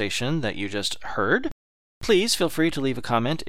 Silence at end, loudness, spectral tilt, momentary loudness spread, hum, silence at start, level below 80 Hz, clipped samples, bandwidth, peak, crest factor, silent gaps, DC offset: 0.05 s; -24 LUFS; -4 dB/octave; 7 LU; none; 0 s; -48 dBFS; under 0.1%; 16.5 kHz; -6 dBFS; 18 dB; 1.52-2.01 s; 2%